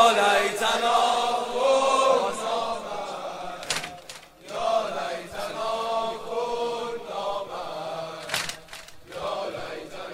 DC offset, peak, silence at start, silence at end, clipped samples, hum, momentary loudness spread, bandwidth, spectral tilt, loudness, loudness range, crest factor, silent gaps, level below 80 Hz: under 0.1%; -4 dBFS; 0 s; 0 s; under 0.1%; none; 15 LU; 16 kHz; -2 dB/octave; -26 LUFS; 8 LU; 22 dB; none; -58 dBFS